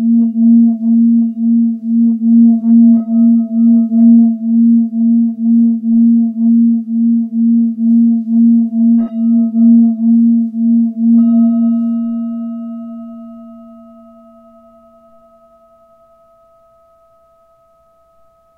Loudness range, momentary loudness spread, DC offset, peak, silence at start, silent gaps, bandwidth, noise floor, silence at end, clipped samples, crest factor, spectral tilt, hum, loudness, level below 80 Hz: 7 LU; 8 LU; under 0.1%; 0 dBFS; 0 s; none; 1.4 kHz; -51 dBFS; 4.95 s; under 0.1%; 10 dB; -13 dB/octave; none; -11 LUFS; -66 dBFS